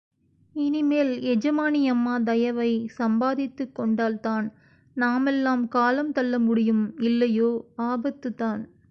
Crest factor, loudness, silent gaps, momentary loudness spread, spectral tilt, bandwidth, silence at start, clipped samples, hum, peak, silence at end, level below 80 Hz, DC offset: 14 dB; -24 LUFS; none; 7 LU; -7 dB/octave; 6.2 kHz; 0.55 s; under 0.1%; none; -10 dBFS; 0.25 s; -66 dBFS; under 0.1%